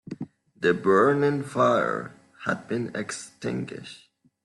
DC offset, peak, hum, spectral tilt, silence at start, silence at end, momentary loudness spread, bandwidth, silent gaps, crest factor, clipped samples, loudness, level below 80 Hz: under 0.1%; -8 dBFS; none; -6 dB/octave; 0.1 s; 0.5 s; 19 LU; 12 kHz; none; 18 dB; under 0.1%; -25 LUFS; -68 dBFS